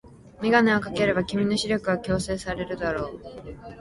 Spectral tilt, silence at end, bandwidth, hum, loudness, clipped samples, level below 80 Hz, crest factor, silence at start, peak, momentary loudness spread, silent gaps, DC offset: -5.5 dB/octave; 0 s; 11.5 kHz; none; -25 LUFS; under 0.1%; -46 dBFS; 20 dB; 0.05 s; -6 dBFS; 18 LU; none; under 0.1%